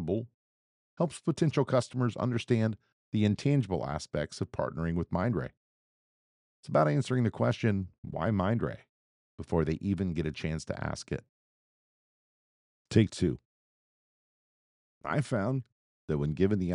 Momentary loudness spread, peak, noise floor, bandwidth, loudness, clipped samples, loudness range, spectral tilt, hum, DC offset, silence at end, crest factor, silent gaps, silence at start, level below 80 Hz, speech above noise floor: 10 LU; -10 dBFS; under -90 dBFS; 11 kHz; -31 LUFS; under 0.1%; 5 LU; -7 dB/octave; none; under 0.1%; 0 s; 22 dB; 0.34-0.97 s, 2.93-3.12 s, 5.57-6.63 s, 7.98-8.03 s, 8.89-9.38 s, 11.29-12.85 s, 13.45-15.01 s, 15.72-16.08 s; 0 s; -54 dBFS; over 60 dB